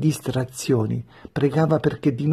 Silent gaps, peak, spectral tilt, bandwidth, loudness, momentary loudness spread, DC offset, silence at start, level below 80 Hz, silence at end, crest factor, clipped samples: none; -6 dBFS; -7 dB/octave; 13.5 kHz; -23 LUFS; 8 LU; under 0.1%; 0 s; -52 dBFS; 0 s; 16 dB; under 0.1%